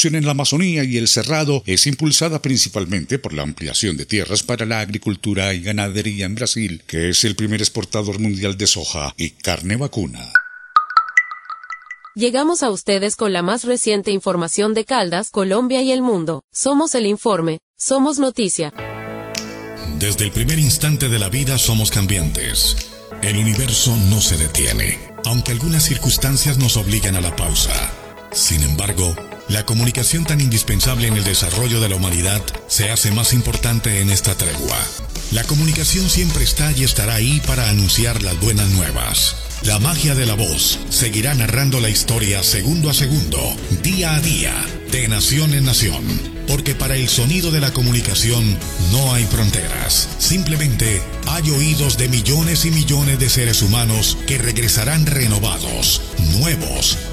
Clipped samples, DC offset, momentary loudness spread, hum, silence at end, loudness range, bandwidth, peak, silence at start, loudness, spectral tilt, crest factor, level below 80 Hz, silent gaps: under 0.1%; under 0.1%; 7 LU; none; 0 s; 4 LU; 16 kHz; 0 dBFS; 0 s; -16 LUFS; -3.5 dB/octave; 18 dB; -28 dBFS; 16.44-16.48 s, 17.62-17.74 s